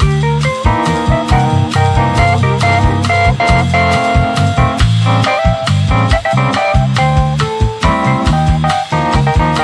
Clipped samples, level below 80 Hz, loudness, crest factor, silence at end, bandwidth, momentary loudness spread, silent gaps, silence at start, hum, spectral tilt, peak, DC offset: under 0.1%; -20 dBFS; -12 LUFS; 12 dB; 0 s; 11 kHz; 2 LU; none; 0 s; none; -6 dB/octave; 0 dBFS; under 0.1%